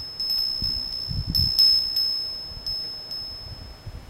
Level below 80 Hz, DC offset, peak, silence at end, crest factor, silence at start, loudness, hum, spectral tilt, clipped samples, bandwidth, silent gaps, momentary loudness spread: -40 dBFS; under 0.1%; -8 dBFS; 0 s; 18 dB; 0 s; -22 LUFS; none; -3 dB/octave; under 0.1%; 16 kHz; none; 19 LU